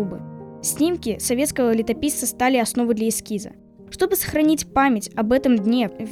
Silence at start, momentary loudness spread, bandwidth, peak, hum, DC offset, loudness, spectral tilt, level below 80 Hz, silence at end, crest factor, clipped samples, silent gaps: 0 s; 11 LU; 18.5 kHz; -6 dBFS; none; under 0.1%; -21 LUFS; -4 dB/octave; -48 dBFS; 0 s; 16 dB; under 0.1%; none